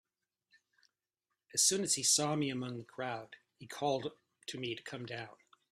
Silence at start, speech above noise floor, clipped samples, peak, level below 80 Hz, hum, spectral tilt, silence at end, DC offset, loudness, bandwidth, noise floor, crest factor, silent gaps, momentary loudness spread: 1.55 s; 53 dB; under 0.1%; -14 dBFS; -78 dBFS; none; -2.5 dB/octave; 0.4 s; under 0.1%; -34 LUFS; 15.5 kHz; -89 dBFS; 24 dB; none; 18 LU